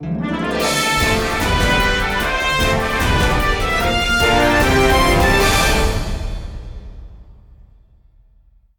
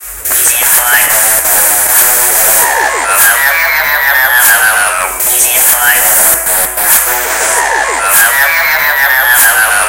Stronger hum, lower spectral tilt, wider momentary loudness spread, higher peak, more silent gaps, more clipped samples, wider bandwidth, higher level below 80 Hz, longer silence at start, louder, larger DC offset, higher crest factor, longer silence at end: neither; first, -4 dB/octave vs 1.5 dB/octave; first, 13 LU vs 4 LU; about the same, -2 dBFS vs 0 dBFS; neither; second, under 0.1% vs 2%; about the same, over 20 kHz vs over 20 kHz; first, -24 dBFS vs -38 dBFS; about the same, 0 s vs 0 s; second, -16 LUFS vs -6 LUFS; first, 0.2% vs under 0.1%; first, 14 dB vs 8 dB; first, 1.45 s vs 0 s